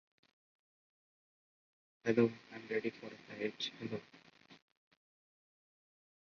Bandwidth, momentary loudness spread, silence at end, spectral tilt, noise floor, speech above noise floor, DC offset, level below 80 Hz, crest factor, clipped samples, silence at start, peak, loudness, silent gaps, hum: 7 kHz; 17 LU; 1.65 s; -4.5 dB/octave; under -90 dBFS; over 52 dB; under 0.1%; -82 dBFS; 26 dB; under 0.1%; 2.05 s; -18 dBFS; -38 LUFS; none; none